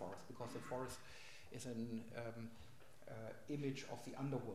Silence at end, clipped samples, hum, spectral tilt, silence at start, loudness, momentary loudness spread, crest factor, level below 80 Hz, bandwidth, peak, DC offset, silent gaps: 0 s; under 0.1%; none; -6 dB/octave; 0 s; -50 LUFS; 12 LU; 18 dB; -74 dBFS; 15.5 kHz; -32 dBFS; 0.1%; none